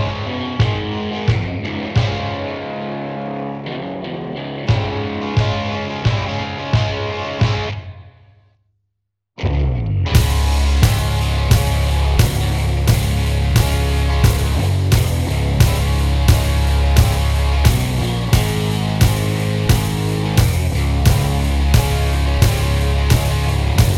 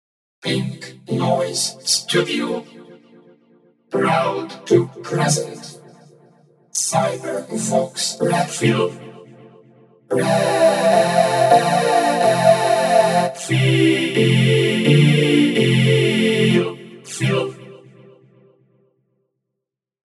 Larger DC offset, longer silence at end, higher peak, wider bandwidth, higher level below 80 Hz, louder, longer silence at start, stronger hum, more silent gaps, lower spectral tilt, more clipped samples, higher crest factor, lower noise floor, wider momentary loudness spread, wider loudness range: neither; second, 0 s vs 2.35 s; about the same, 0 dBFS vs 0 dBFS; first, 17 kHz vs 13.5 kHz; first, -20 dBFS vs -74 dBFS; about the same, -18 LUFS vs -17 LUFS; second, 0 s vs 0.45 s; neither; neither; about the same, -5.5 dB/octave vs -5 dB/octave; neither; about the same, 16 dB vs 18 dB; second, -74 dBFS vs -82 dBFS; second, 9 LU vs 12 LU; about the same, 6 LU vs 7 LU